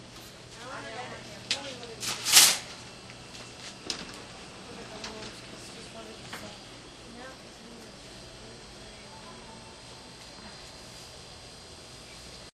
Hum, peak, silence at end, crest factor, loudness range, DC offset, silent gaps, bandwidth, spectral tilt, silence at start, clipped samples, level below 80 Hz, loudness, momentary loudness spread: none; -2 dBFS; 0.05 s; 32 dB; 20 LU; under 0.1%; none; 14 kHz; 0 dB/octave; 0 s; under 0.1%; -60 dBFS; -26 LUFS; 14 LU